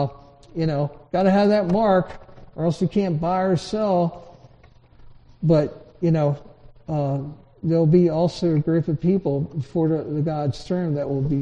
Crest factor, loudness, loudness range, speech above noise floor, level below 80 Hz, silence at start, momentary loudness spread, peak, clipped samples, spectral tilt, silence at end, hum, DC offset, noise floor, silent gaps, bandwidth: 16 dB; -22 LUFS; 3 LU; 30 dB; -48 dBFS; 0 s; 11 LU; -4 dBFS; under 0.1%; -8.5 dB/octave; 0 s; none; under 0.1%; -51 dBFS; none; 9.2 kHz